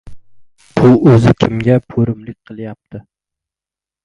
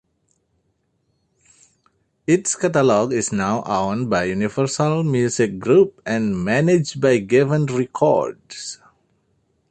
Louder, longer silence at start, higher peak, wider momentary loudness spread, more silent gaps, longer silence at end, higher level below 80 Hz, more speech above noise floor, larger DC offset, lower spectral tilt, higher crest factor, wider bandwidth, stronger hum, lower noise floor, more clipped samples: first, -12 LUFS vs -19 LUFS; second, 0.05 s vs 2.3 s; about the same, 0 dBFS vs -2 dBFS; first, 21 LU vs 8 LU; neither; about the same, 1.05 s vs 0.95 s; first, -40 dBFS vs -54 dBFS; first, 77 dB vs 50 dB; neither; first, -8.5 dB/octave vs -5.5 dB/octave; about the same, 14 dB vs 18 dB; about the same, 9.6 kHz vs 9 kHz; neither; first, -89 dBFS vs -68 dBFS; first, 0.1% vs under 0.1%